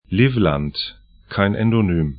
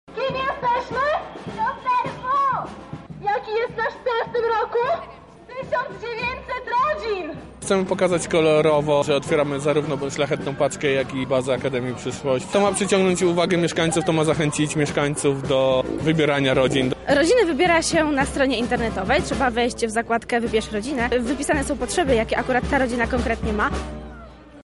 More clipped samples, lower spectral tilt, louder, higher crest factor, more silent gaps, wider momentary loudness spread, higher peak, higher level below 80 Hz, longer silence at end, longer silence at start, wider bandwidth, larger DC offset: neither; first, -12 dB/octave vs -4.5 dB/octave; about the same, -19 LUFS vs -21 LUFS; about the same, 18 dB vs 14 dB; neither; first, 11 LU vs 8 LU; first, 0 dBFS vs -8 dBFS; about the same, -38 dBFS vs -40 dBFS; about the same, 0 s vs 0 s; about the same, 0.1 s vs 0.1 s; second, 5.2 kHz vs 11.5 kHz; neither